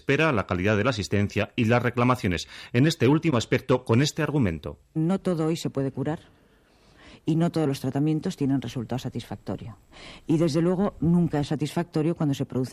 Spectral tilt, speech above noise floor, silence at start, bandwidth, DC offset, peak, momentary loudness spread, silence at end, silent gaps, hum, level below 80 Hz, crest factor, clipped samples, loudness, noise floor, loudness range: -6.5 dB/octave; 34 dB; 0.1 s; 14.5 kHz; under 0.1%; -8 dBFS; 12 LU; 0 s; none; none; -52 dBFS; 16 dB; under 0.1%; -25 LUFS; -59 dBFS; 5 LU